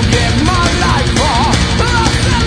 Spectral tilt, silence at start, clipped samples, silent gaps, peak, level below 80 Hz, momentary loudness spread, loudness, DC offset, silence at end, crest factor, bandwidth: -4.5 dB/octave; 0 s; under 0.1%; none; 0 dBFS; -18 dBFS; 1 LU; -12 LUFS; under 0.1%; 0 s; 12 dB; 10.5 kHz